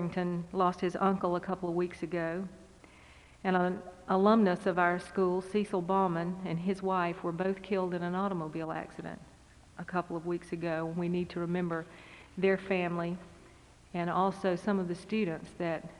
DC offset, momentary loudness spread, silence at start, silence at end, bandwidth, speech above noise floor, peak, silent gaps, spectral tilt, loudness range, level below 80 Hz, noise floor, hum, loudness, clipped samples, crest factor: under 0.1%; 11 LU; 0 s; 0 s; 11 kHz; 25 dB; -12 dBFS; none; -7.5 dB/octave; 7 LU; -62 dBFS; -57 dBFS; none; -32 LUFS; under 0.1%; 20 dB